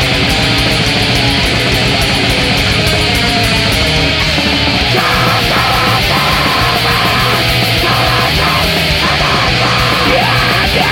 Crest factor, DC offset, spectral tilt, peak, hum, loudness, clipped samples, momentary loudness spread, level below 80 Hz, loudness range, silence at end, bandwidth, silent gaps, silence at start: 12 dB; under 0.1%; -4 dB/octave; 0 dBFS; none; -10 LUFS; under 0.1%; 1 LU; -24 dBFS; 0 LU; 0 s; 16.5 kHz; none; 0 s